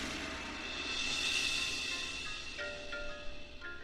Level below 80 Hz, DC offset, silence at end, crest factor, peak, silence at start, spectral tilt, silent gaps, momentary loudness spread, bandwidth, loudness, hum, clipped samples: -54 dBFS; under 0.1%; 0 s; 18 dB; -20 dBFS; 0 s; -1 dB/octave; none; 15 LU; 15 kHz; -36 LUFS; none; under 0.1%